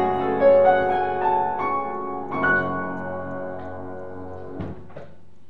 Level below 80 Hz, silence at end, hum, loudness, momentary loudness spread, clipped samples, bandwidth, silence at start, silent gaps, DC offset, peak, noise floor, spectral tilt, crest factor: -54 dBFS; 0.4 s; none; -22 LUFS; 19 LU; under 0.1%; 4.8 kHz; 0 s; none; 1%; -6 dBFS; -47 dBFS; -8.5 dB/octave; 18 dB